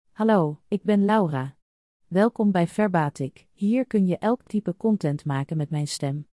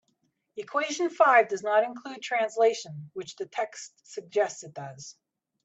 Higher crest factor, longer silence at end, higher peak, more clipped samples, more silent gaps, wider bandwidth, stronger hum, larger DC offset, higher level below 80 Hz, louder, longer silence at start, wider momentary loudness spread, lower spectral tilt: about the same, 16 dB vs 20 dB; second, 0.1 s vs 0.55 s; about the same, -8 dBFS vs -8 dBFS; neither; first, 1.62-2.00 s vs none; first, 12 kHz vs 8.2 kHz; neither; neither; first, -66 dBFS vs -82 dBFS; about the same, -24 LUFS vs -26 LUFS; second, 0.2 s vs 0.55 s; second, 8 LU vs 21 LU; first, -7 dB/octave vs -3.5 dB/octave